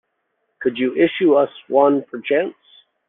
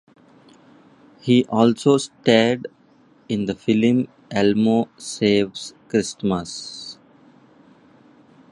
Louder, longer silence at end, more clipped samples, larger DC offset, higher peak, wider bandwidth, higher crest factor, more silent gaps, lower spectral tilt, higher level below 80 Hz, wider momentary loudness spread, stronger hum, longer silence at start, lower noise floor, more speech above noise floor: about the same, -18 LUFS vs -20 LUFS; second, 0.55 s vs 1.6 s; neither; neither; about the same, -2 dBFS vs -2 dBFS; second, 4 kHz vs 11.5 kHz; about the same, 18 dB vs 20 dB; neither; first, -9 dB/octave vs -5.5 dB/octave; second, -68 dBFS vs -58 dBFS; second, 8 LU vs 15 LU; neither; second, 0.6 s vs 1.25 s; first, -71 dBFS vs -54 dBFS; first, 54 dB vs 35 dB